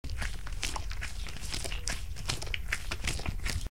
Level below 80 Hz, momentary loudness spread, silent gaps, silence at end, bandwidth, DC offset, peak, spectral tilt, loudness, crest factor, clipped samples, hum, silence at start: -38 dBFS; 5 LU; none; 0.05 s; 17 kHz; 1%; -10 dBFS; -2.5 dB/octave; -36 LUFS; 26 dB; under 0.1%; none; 0.05 s